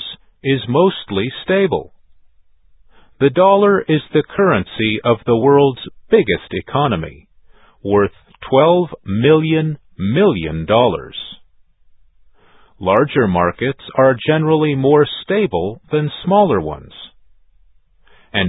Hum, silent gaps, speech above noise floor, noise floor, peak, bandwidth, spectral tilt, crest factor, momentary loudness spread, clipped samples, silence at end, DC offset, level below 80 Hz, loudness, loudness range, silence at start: none; none; 35 dB; -50 dBFS; 0 dBFS; 4 kHz; -11 dB/octave; 16 dB; 11 LU; under 0.1%; 0 s; under 0.1%; -44 dBFS; -15 LUFS; 4 LU; 0 s